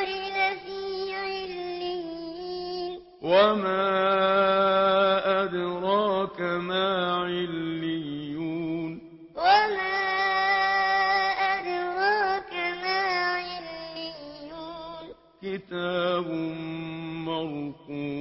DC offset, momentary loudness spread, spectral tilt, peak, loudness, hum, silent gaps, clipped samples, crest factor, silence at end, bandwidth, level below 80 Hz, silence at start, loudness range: under 0.1%; 15 LU; -8 dB/octave; -8 dBFS; -26 LUFS; none; none; under 0.1%; 18 dB; 0 s; 5.8 kHz; -62 dBFS; 0 s; 9 LU